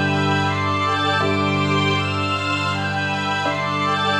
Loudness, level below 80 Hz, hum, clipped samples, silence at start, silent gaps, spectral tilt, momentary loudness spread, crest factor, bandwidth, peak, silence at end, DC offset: -20 LUFS; -56 dBFS; 50 Hz at -55 dBFS; under 0.1%; 0 s; none; -5 dB/octave; 3 LU; 12 dB; 11 kHz; -8 dBFS; 0 s; under 0.1%